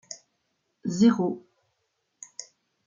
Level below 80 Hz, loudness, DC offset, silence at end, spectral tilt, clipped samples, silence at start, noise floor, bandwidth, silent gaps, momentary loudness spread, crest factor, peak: -70 dBFS; -24 LUFS; under 0.1%; 0.45 s; -6 dB/octave; under 0.1%; 0.1 s; -77 dBFS; 7.6 kHz; none; 22 LU; 20 dB; -8 dBFS